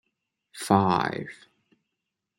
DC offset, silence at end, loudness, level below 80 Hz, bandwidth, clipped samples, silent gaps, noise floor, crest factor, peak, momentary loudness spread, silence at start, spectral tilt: under 0.1%; 1.05 s; -25 LUFS; -66 dBFS; 16 kHz; under 0.1%; none; -84 dBFS; 24 dB; -4 dBFS; 17 LU; 0.55 s; -6 dB/octave